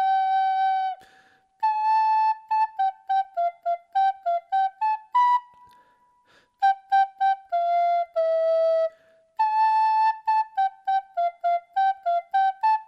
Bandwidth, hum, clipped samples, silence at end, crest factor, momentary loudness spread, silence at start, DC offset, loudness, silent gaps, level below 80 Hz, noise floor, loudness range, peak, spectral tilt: 6.4 kHz; none; under 0.1%; 0.05 s; 12 dB; 6 LU; 0 s; under 0.1%; -24 LUFS; none; -84 dBFS; -61 dBFS; 2 LU; -12 dBFS; 0 dB/octave